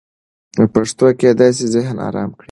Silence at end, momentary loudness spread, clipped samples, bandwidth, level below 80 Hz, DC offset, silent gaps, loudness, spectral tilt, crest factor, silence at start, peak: 0.2 s; 11 LU; under 0.1%; 11.5 kHz; -50 dBFS; under 0.1%; none; -15 LUFS; -6 dB/octave; 14 dB; 0.55 s; 0 dBFS